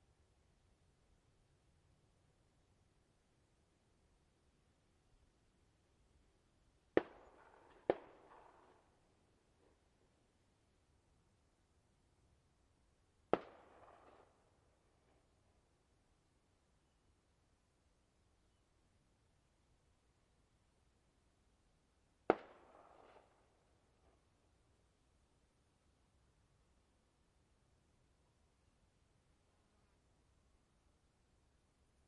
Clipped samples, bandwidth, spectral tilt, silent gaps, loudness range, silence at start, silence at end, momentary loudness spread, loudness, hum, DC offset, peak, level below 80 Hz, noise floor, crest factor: under 0.1%; 10.5 kHz; -6.5 dB/octave; none; 4 LU; 6.95 s; 9.65 s; 25 LU; -42 LUFS; none; under 0.1%; -12 dBFS; -80 dBFS; -78 dBFS; 42 dB